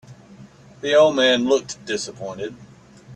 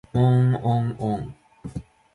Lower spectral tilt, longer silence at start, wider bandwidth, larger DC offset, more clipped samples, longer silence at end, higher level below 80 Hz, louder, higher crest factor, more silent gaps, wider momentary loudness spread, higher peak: second, -3.5 dB/octave vs -9.5 dB/octave; about the same, 0.1 s vs 0.15 s; about the same, 9.6 kHz vs 10 kHz; neither; neither; second, 0 s vs 0.35 s; second, -60 dBFS vs -48 dBFS; first, -19 LUFS vs -22 LUFS; about the same, 18 dB vs 14 dB; neither; second, 16 LU vs 20 LU; first, -4 dBFS vs -8 dBFS